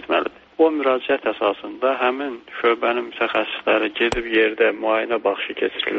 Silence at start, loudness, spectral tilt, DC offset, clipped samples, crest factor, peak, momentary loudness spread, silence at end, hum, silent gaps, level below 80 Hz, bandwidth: 0 s; -21 LUFS; -0.5 dB/octave; under 0.1%; under 0.1%; 16 dB; -6 dBFS; 5 LU; 0 s; none; none; -50 dBFS; 7.6 kHz